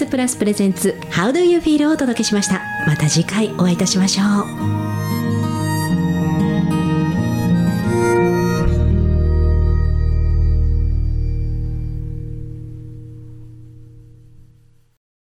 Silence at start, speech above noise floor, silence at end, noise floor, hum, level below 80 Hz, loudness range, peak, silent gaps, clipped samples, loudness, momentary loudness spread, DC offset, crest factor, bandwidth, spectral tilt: 0 s; 34 dB; 1.35 s; -50 dBFS; none; -24 dBFS; 11 LU; -4 dBFS; none; under 0.1%; -17 LUFS; 12 LU; under 0.1%; 14 dB; 15 kHz; -5.5 dB/octave